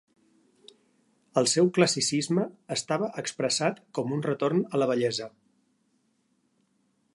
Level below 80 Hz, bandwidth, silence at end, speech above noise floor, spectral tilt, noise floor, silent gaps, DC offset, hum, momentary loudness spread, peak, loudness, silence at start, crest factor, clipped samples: -74 dBFS; 11.5 kHz; 1.85 s; 45 dB; -4 dB/octave; -71 dBFS; none; under 0.1%; none; 9 LU; -6 dBFS; -27 LUFS; 1.35 s; 22 dB; under 0.1%